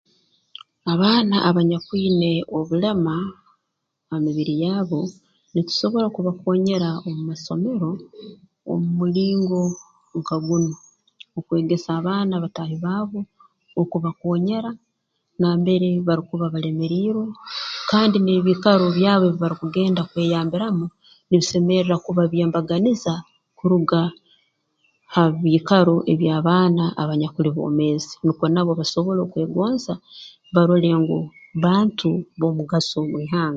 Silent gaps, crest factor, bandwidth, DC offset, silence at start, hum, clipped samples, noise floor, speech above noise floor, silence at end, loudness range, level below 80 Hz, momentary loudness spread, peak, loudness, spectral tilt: none; 20 dB; 7.6 kHz; under 0.1%; 0.85 s; none; under 0.1%; -77 dBFS; 57 dB; 0 s; 5 LU; -60 dBFS; 11 LU; 0 dBFS; -21 LUFS; -7 dB/octave